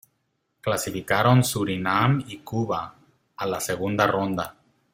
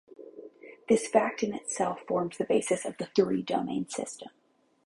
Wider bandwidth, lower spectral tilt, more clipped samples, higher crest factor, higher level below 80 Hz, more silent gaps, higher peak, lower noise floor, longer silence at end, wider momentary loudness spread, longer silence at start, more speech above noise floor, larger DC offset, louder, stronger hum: first, 16.5 kHz vs 11.5 kHz; about the same, -5 dB/octave vs -4.5 dB/octave; neither; about the same, 20 dB vs 22 dB; first, -58 dBFS vs -70 dBFS; neither; first, -4 dBFS vs -8 dBFS; first, -74 dBFS vs -49 dBFS; second, 0.4 s vs 0.6 s; second, 12 LU vs 22 LU; first, 0.65 s vs 0.2 s; first, 50 dB vs 20 dB; neither; first, -24 LUFS vs -29 LUFS; neither